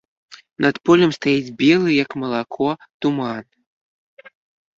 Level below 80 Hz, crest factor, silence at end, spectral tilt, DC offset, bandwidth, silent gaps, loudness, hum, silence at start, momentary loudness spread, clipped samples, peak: -60 dBFS; 18 dB; 1.35 s; -6 dB/octave; under 0.1%; 7.6 kHz; 2.94-3.00 s; -19 LUFS; none; 0.3 s; 10 LU; under 0.1%; -2 dBFS